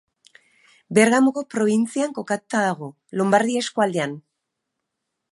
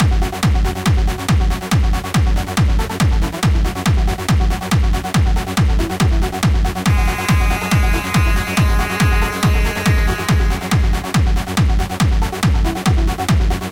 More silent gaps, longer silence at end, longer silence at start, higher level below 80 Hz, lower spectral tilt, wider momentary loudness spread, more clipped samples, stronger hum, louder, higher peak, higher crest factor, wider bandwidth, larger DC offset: neither; first, 1.15 s vs 0 s; first, 0.9 s vs 0 s; second, -70 dBFS vs -18 dBFS; about the same, -5 dB/octave vs -5.5 dB/octave; first, 12 LU vs 1 LU; neither; neither; second, -21 LUFS vs -17 LUFS; about the same, -2 dBFS vs -2 dBFS; first, 20 dB vs 12 dB; second, 11.5 kHz vs 17 kHz; neither